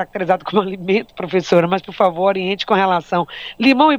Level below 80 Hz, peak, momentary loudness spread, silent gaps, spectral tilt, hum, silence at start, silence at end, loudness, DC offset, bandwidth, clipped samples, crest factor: -56 dBFS; 0 dBFS; 6 LU; none; -6 dB/octave; none; 0 s; 0 s; -17 LUFS; under 0.1%; 12.5 kHz; under 0.1%; 16 dB